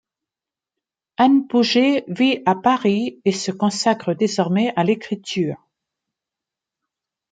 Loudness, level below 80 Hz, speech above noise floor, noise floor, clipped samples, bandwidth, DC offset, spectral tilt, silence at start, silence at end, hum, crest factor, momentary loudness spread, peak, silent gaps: -19 LUFS; -68 dBFS; 70 dB; -89 dBFS; under 0.1%; 9.4 kHz; under 0.1%; -5 dB/octave; 1.2 s; 1.75 s; none; 16 dB; 8 LU; -4 dBFS; none